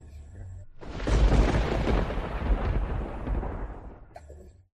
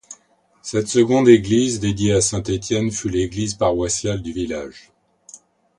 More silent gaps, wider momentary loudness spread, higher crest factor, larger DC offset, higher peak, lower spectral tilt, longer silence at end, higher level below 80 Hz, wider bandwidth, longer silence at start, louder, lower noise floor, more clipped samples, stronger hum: neither; first, 23 LU vs 13 LU; about the same, 18 dB vs 20 dB; neither; second, -10 dBFS vs 0 dBFS; first, -7 dB/octave vs -5 dB/octave; second, 0.25 s vs 0.45 s; first, -30 dBFS vs -42 dBFS; second, 9 kHz vs 11 kHz; about the same, 0 s vs 0.1 s; second, -29 LUFS vs -19 LUFS; second, -48 dBFS vs -58 dBFS; neither; neither